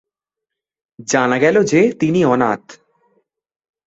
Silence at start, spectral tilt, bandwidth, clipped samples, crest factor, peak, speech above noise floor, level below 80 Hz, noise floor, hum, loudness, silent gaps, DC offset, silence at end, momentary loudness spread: 1 s; -5.5 dB/octave; 8.2 kHz; under 0.1%; 16 dB; -2 dBFS; 68 dB; -58 dBFS; -83 dBFS; none; -15 LUFS; none; under 0.1%; 1.15 s; 8 LU